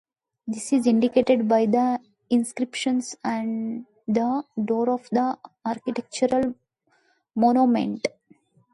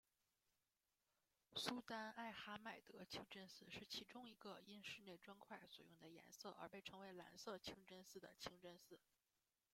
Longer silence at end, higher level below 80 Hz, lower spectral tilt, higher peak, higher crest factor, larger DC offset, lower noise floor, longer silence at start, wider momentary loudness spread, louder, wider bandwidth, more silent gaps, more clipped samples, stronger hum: about the same, 0.65 s vs 0.75 s; first, -66 dBFS vs -88 dBFS; first, -5.5 dB/octave vs -3 dB/octave; first, -6 dBFS vs -28 dBFS; second, 18 dB vs 32 dB; neither; second, -66 dBFS vs under -90 dBFS; second, 0.45 s vs 1.5 s; about the same, 12 LU vs 12 LU; first, -24 LUFS vs -56 LUFS; second, 11.5 kHz vs 16 kHz; neither; neither; neither